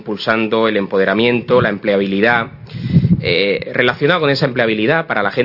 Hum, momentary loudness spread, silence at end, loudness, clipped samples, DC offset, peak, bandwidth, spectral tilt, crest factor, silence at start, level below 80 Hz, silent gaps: none; 3 LU; 0 s; -15 LUFS; under 0.1%; under 0.1%; 0 dBFS; 5.8 kHz; -8 dB/octave; 14 dB; 0 s; -44 dBFS; none